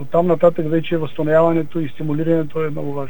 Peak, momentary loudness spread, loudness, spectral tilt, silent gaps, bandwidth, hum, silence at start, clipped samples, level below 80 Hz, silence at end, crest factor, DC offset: -2 dBFS; 9 LU; -18 LUFS; -9 dB/octave; none; 18 kHz; none; 0 s; under 0.1%; -56 dBFS; 0 s; 16 dB; 6%